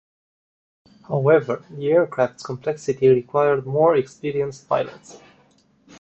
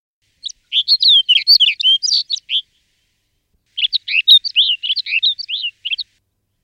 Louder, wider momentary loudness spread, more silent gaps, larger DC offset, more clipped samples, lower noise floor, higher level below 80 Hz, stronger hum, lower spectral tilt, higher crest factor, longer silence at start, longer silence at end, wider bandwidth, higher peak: second, -21 LUFS vs -12 LUFS; second, 10 LU vs 15 LU; neither; neither; neither; second, -58 dBFS vs -66 dBFS; first, -62 dBFS vs -68 dBFS; neither; first, -7 dB/octave vs 6.5 dB/octave; about the same, 18 dB vs 16 dB; first, 1.1 s vs 0.45 s; first, 0.9 s vs 0.6 s; second, 8.2 kHz vs 15.5 kHz; second, -4 dBFS vs 0 dBFS